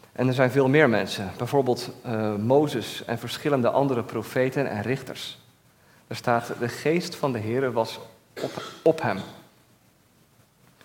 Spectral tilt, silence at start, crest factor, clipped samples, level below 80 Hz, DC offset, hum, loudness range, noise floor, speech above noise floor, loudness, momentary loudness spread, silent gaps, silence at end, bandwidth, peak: -6 dB/octave; 0.2 s; 24 dB; under 0.1%; -68 dBFS; under 0.1%; none; 5 LU; -60 dBFS; 36 dB; -25 LUFS; 12 LU; none; 1.45 s; 17.5 kHz; -2 dBFS